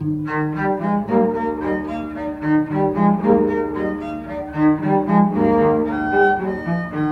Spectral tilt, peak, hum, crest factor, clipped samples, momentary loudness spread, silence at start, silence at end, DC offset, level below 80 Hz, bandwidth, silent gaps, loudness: -9.5 dB/octave; -2 dBFS; none; 16 dB; under 0.1%; 9 LU; 0 s; 0 s; under 0.1%; -44 dBFS; 5.8 kHz; none; -19 LUFS